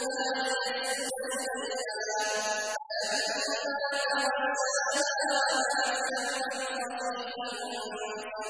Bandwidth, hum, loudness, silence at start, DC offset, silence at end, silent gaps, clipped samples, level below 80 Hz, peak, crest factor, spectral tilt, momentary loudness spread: 11 kHz; none; -30 LUFS; 0 s; under 0.1%; 0 s; none; under 0.1%; -74 dBFS; -16 dBFS; 14 dB; 0.5 dB/octave; 8 LU